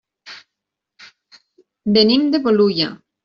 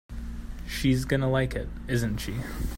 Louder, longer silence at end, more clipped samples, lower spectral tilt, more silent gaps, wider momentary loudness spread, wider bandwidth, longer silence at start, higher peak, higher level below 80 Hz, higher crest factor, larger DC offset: first, -16 LUFS vs -28 LUFS; first, 0.3 s vs 0 s; neither; about the same, -7 dB/octave vs -6 dB/octave; neither; first, 25 LU vs 15 LU; second, 6.8 kHz vs 16.5 kHz; first, 0.25 s vs 0.1 s; first, -2 dBFS vs -12 dBFS; second, -60 dBFS vs -36 dBFS; about the same, 16 dB vs 18 dB; neither